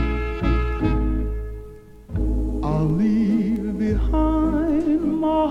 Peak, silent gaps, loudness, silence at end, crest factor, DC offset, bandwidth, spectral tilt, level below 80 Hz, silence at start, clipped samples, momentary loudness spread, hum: -6 dBFS; none; -22 LUFS; 0 s; 14 dB; under 0.1%; 6.2 kHz; -9 dB/octave; -26 dBFS; 0 s; under 0.1%; 10 LU; none